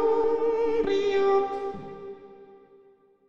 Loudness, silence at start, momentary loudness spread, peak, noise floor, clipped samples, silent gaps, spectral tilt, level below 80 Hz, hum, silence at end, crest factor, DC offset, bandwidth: -25 LUFS; 0 s; 18 LU; -14 dBFS; -58 dBFS; under 0.1%; none; -5.5 dB/octave; -56 dBFS; none; 0 s; 12 dB; under 0.1%; 7.4 kHz